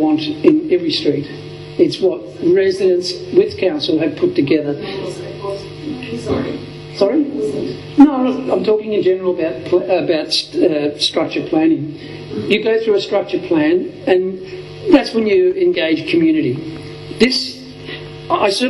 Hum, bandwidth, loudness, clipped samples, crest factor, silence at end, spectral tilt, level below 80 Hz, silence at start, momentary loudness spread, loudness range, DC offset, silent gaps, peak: none; 11.5 kHz; -16 LUFS; under 0.1%; 16 dB; 0 s; -5.5 dB/octave; -50 dBFS; 0 s; 14 LU; 4 LU; under 0.1%; none; 0 dBFS